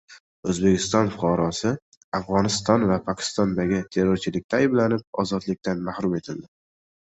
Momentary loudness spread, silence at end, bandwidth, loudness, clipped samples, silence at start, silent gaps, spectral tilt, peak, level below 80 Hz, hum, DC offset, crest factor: 9 LU; 0.6 s; 8.2 kHz; -24 LUFS; under 0.1%; 0.1 s; 0.20-0.43 s, 1.82-2.12 s, 4.44-4.49 s, 5.07-5.13 s; -5.5 dB/octave; -6 dBFS; -50 dBFS; none; under 0.1%; 18 dB